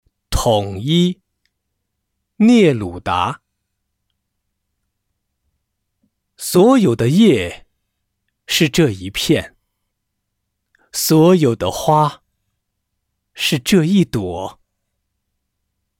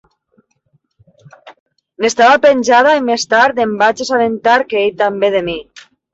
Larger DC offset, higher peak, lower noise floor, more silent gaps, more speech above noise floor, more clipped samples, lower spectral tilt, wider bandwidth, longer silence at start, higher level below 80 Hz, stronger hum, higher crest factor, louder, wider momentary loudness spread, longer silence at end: neither; about the same, -2 dBFS vs 0 dBFS; first, -75 dBFS vs -61 dBFS; second, none vs 1.60-1.66 s; first, 60 dB vs 49 dB; neither; first, -5.5 dB/octave vs -3 dB/octave; first, 17 kHz vs 8 kHz; second, 0.3 s vs 1.45 s; first, -40 dBFS vs -54 dBFS; neither; about the same, 16 dB vs 14 dB; second, -15 LUFS vs -12 LUFS; first, 13 LU vs 8 LU; first, 1.5 s vs 0.5 s